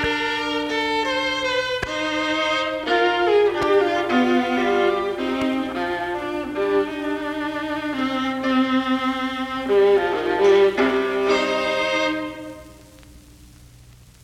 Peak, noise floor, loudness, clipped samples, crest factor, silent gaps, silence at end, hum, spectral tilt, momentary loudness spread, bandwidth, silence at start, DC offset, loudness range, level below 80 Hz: -6 dBFS; -47 dBFS; -21 LUFS; under 0.1%; 16 dB; none; 0.6 s; none; -4 dB/octave; 8 LU; 14 kHz; 0 s; under 0.1%; 5 LU; -50 dBFS